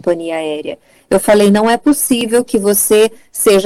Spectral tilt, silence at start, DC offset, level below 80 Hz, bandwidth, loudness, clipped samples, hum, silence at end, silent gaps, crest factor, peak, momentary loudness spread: -4 dB/octave; 0.05 s; under 0.1%; -46 dBFS; 16.5 kHz; -12 LUFS; under 0.1%; none; 0 s; none; 10 dB; -2 dBFS; 11 LU